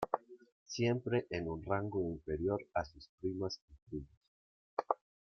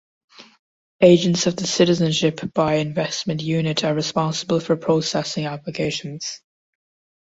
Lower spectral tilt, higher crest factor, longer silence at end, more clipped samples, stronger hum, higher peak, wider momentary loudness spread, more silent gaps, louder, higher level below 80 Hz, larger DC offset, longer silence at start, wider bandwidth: first, -6.5 dB/octave vs -5 dB/octave; first, 26 dB vs 20 dB; second, 0.35 s vs 1 s; neither; neither; second, -14 dBFS vs -2 dBFS; about the same, 12 LU vs 11 LU; first, 0.52-0.66 s, 3.09-3.18 s, 3.62-3.68 s, 3.82-3.86 s, 4.17-4.21 s, 4.28-4.77 s vs 0.59-0.99 s; second, -39 LUFS vs -20 LUFS; second, -62 dBFS vs -56 dBFS; neither; second, 0 s vs 0.4 s; second, 7 kHz vs 8 kHz